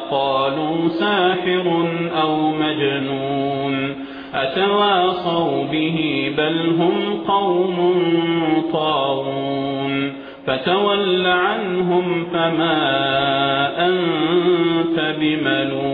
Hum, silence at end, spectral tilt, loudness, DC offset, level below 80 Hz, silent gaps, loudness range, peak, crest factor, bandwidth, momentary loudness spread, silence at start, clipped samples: none; 0 s; -8.5 dB/octave; -18 LUFS; under 0.1%; -56 dBFS; none; 2 LU; -6 dBFS; 14 dB; 5 kHz; 5 LU; 0 s; under 0.1%